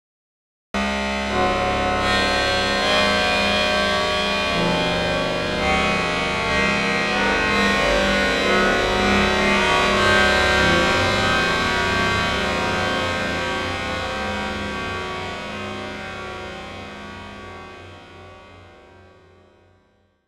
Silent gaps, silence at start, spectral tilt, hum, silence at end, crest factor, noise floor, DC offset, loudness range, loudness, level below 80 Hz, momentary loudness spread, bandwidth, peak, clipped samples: none; 0.75 s; -4 dB/octave; none; 1.6 s; 16 dB; -61 dBFS; under 0.1%; 15 LU; -19 LUFS; -36 dBFS; 14 LU; 15 kHz; -4 dBFS; under 0.1%